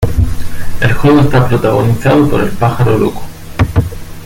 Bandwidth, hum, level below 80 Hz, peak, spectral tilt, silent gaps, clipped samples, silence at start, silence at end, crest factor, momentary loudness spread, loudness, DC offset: 17 kHz; none; -22 dBFS; 0 dBFS; -7.5 dB/octave; none; under 0.1%; 0 s; 0 s; 10 dB; 15 LU; -11 LUFS; under 0.1%